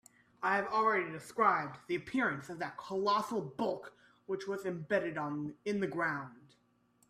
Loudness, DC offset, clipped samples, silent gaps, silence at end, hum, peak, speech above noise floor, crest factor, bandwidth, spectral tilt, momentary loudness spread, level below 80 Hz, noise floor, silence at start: -35 LUFS; under 0.1%; under 0.1%; none; 0.7 s; none; -16 dBFS; 37 dB; 20 dB; 14.5 kHz; -5.5 dB/octave; 12 LU; -76 dBFS; -71 dBFS; 0.4 s